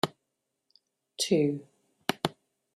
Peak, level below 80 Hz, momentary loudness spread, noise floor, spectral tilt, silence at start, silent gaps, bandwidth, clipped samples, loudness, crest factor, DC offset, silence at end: -8 dBFS; -72 dBFS; 12 LU; -83 dBFS; -4.5 dB/octave; 0.05 s; none; 16 kHz; under 0.1%; -31 LUFS; 24 dB; under 0.1%; 0.45 s